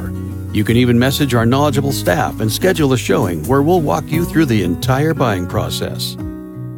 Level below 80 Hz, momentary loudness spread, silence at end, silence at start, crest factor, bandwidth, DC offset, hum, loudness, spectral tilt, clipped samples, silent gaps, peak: -36 dBFS; 9 LU; 0 s; 0 s; 14 dB; 17.5 kHz; under 0.1%; none; -15 LUFS; -6 dB/octave; under 0.1%; none; 0 dBFS